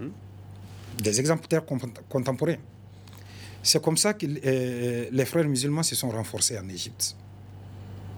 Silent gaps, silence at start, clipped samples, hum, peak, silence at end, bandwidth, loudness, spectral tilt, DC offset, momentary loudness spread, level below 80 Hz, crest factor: none; 0 s; under 0.1%; none; -6 dBFS; 0 s; over 20 kHz; -26 LUFS; -4 dB/octave; under 0.1%; 22 LU; -62 dBFS; 22 dB